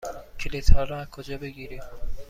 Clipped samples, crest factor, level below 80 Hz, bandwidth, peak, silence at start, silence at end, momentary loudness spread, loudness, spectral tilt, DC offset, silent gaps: under 0.1%; 20 dB; -26 dBFS; 7.4 kHz; -2 dBFS; 0.05 s; 0.05 s; 16 LU; -31 LUFS; -5.5 dB/octave; under 0.1%; none